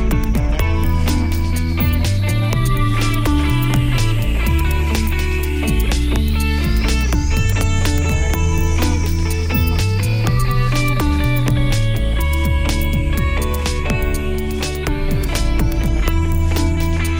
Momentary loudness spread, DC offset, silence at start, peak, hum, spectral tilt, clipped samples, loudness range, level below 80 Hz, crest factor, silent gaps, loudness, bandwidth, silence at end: 3 LU; under 0.1%; 0 s; -2 dBFS; none; -5.5 dB/octave; under 0.1%; 2 LU; -18 dBFS; 14 dB; none; -18 LUFS; 16.5 kHz; 0 s